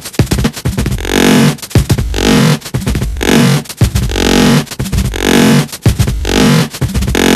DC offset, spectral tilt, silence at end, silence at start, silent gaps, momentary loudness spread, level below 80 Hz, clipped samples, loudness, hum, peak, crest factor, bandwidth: under 0.1%; -5 dB/octave; 0 s; 0 s; none; 7 LU; -20 dBFS; 0.4%; -11 LUFS; none; 0 dBFS; 10 dB; 15 kHz